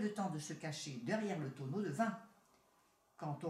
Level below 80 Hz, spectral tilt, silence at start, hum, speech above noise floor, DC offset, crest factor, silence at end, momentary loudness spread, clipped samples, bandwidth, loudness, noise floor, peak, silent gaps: -86 dBFS; -5.5 dB/octave; 0 s; none; 33 dB; under 0.1%; 18 dB; 0 s; 7 LU; under 0.1%; 14.5 kHz; -42 LUFS; -74 dBFS; -24 dBFS; none